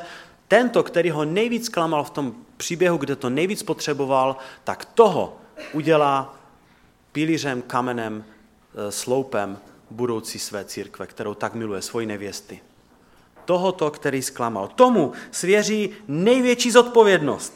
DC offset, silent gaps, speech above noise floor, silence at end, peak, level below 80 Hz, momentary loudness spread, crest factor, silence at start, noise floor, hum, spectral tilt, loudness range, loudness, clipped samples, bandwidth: under 0.1%; none; 35 dB; 0.05 s; -2 dBFS; -64 dBFS; 15 LU; 22 dB; 0 s; -56 dBFS; none; -4.5 dB/octave; 9 LU; -21 LUFS; under 0.1%; 16.5 kHz